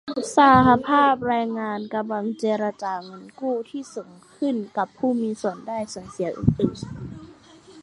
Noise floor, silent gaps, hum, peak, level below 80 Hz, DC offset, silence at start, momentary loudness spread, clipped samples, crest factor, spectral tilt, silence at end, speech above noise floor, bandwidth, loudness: -48 dBFS; none; none; -2 dBFS; -48 dBFS; under 0.1%; 0.05 s; 19 LU; under 0.1%; 20 dB; -6 dB/octave; 0 s; 26 dB; 11.5 kHz; -22 LUFS